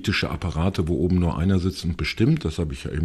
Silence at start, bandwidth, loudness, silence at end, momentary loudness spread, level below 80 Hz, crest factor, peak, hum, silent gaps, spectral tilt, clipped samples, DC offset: 0 s; 13 kHz; -23 LUFS; 0 s; 6 LU; -38 dBFS; 14 dB; -8 dBFS; none; none; -6.5 dB/octave; under 0.1%; under 0.1%